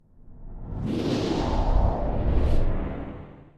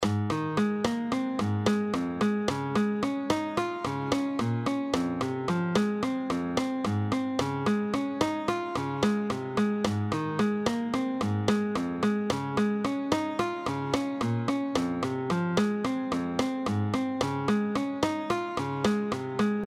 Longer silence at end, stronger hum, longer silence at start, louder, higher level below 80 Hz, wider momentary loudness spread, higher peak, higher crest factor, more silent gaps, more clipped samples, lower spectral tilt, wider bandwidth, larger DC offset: first, 0.15 s vs 0 s; neither; first, 0.25 s vs 0 s; about the same, -27 LUFS vs -29 LUFS; first, -26 dBFS vs -58 dBFS; first, 14 LU vs 3 LU; about the same, -8 dBFS vs -10 dBFS; about the same, 16 dB vs 18 dB; neither; neither; first, -7.5 dB/octave vs -6 dB/octave; second, 7.8 kHz vs 14.5 kHz; neither